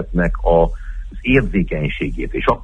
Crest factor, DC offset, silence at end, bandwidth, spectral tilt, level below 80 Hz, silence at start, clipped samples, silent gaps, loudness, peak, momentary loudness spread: 16 dB; under 0.1%; 0 s; 5.6 kHz; -8.5 dB/octave; -24 dBFS; 0 s; under 0.1%; none; -18 LUFS; -2 dBFS; 10 LU